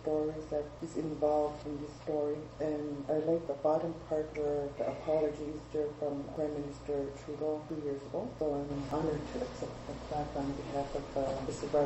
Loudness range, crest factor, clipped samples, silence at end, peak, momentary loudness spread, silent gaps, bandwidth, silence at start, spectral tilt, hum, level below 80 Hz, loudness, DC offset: 3 LU; 16 dB; under 0.1%; 0 s; -18 dBFS; 8 LU; none; 8.4 kHz; 0 s; -7 dB/octave; none; -54 dBFS; -36 LUFS; under 0.1%